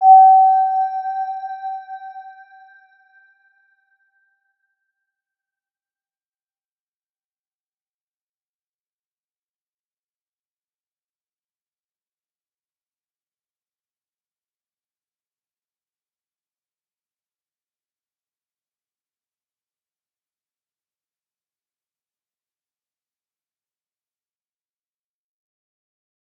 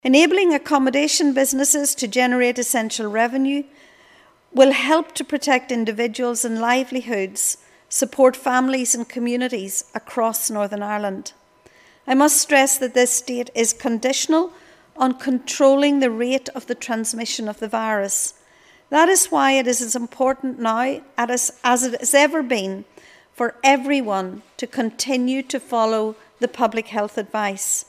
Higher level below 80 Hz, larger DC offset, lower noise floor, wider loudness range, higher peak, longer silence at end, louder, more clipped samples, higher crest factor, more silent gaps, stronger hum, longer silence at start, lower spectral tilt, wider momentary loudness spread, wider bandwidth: second, under -90 dBFS vs -68 dBFS; neither; first, under -90 dBFS vs -53 dBFS; first, 26 LU vs 4 LU; about the same, -2 dBFS vs 0 dBFS; first, 23.9 s vs 0.05 s; first, -14 LUFS vs -19 LUFS; neither; about the same, 24 dB vs 20 dB; neither; neither; about the same, 0 s vs 0.05 s; second, 5 dB/octave vs -2 dB/octave; first, 26 LU vs 10 LU; second, 4.1 kHz vs 16 kHz